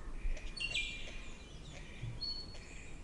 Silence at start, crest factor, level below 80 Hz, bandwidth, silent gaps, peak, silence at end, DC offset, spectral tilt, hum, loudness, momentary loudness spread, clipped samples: 0 s; 18 dB; -46 dBFS; 11 kHz; none; -24 dBFS; 0 s; under 0.1%; -3 dB/octave; none; -43 LUFS; 14 LU; under 0.1%